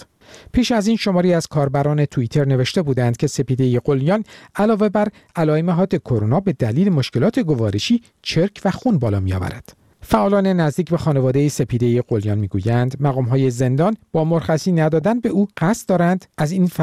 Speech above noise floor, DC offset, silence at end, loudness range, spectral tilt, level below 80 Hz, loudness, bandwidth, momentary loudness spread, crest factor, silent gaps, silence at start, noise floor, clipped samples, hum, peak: 27 dB; 0.2%; 0 s; 1 LU; -7 dB/octave; -44 dBFS; -18 LUFS; 14.5 kHz; 4 LU; 16 dB; none; 0 s; -45 dBFS; under 0.1%; none; -2 dBFS